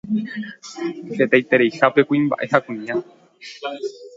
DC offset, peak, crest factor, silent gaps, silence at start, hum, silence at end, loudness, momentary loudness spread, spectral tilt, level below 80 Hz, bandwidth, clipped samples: under 0.1%; 0 dBFS; 20 dB; none; 0.05 s; none; 0.05 s; -20 LUFS; 16 LU; -6 dB/octave; -66 dBFS; 7.8 kHz; under 0.1%